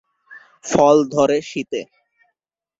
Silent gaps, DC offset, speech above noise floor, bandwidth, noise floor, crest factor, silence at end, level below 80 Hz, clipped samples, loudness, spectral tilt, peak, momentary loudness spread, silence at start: none; under 0.1%; 61 dB; 7.8 kHz; -78 dBFS; 18 dB; 0.95 s; -58 dBFS; under 0.1%; -17 LUFS; -5 dB/octave; -2 dBFS; 15 LU; 0.3 s